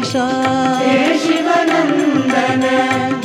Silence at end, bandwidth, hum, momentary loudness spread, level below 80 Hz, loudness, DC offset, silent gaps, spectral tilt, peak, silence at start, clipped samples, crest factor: 0 s; 14 kHz; none; 2 LU; -64 dBFS; -14 LUFS; under 0.1%; none; -4.5 dB/octave; -2 dBFS; 0 s; under 0.1%; 12 dB